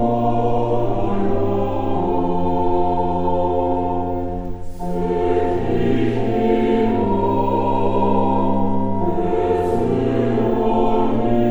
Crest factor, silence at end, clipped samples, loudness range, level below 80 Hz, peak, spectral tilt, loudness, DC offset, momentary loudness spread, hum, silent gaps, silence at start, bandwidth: 12 dB; 0 s; under 0.1%; 2 LU; -32 dBFS; -4 dBFS; -9 dB/octave; -20 LUFS; 1%; 4 LU; none; none; 0 s; over 20 kHz